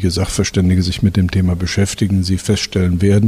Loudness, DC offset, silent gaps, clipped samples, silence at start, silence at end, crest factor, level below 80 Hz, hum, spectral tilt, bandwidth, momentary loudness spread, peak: -16 LUFS; under 0.1%; none; under 0.1%; 0 s; 0 s; 12 dB; -32 dBFS; none; -5.5 dB/octave; 14 kHz; 3 LU; -2 dBFS